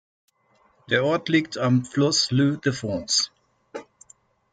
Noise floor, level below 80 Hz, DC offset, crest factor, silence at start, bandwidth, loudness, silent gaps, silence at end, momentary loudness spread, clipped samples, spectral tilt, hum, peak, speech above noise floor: -63 dBFS; -62 dBFS; under 0.1%; 20 dB; 0.9 s; 9.6 kHz; -22 LUFS; none; 0.7 s; 20 LU; under 0.1%; -4 dB/octave; none; -6 dBFS; 41 dB